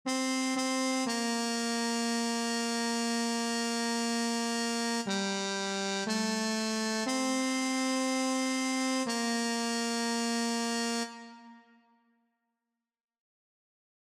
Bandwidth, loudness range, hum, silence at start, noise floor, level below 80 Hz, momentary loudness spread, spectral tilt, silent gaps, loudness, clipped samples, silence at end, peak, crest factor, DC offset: 15.5 kHz; 5 LU; none; 0.05 s; -88 dBFS; -76 dBFS; 2 LU; -2.5 dB/octave; none; -31 LUFS; under 0.1%; 2.45 s; -18 dBFS; 14 dB; under 0.1%